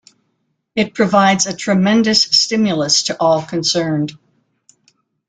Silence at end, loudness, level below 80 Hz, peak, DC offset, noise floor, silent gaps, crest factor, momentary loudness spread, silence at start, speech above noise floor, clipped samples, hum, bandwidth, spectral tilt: 1.15 s; -14 LUFS; -56 dBFS; 0 dBFS; under 0.1%; -68 dBFS; none; 16 dB; 8 LU; 0.75 s; 53 dB; under 0.1%; none; 9.4 kHz; -3.5 dB/octave